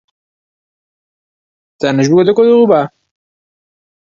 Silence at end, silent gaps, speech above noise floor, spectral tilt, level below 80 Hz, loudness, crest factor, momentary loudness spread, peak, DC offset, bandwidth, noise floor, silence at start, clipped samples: 1.2 s; none; over 81 dB; -6.5 dB/octave; -60 dBFS; -11 LUFS; 14 dB; 10 LU; 0 dBFS; under 0.1%; 7.4 kHz; under -90 dBFS; 1.8 s; under 0.1%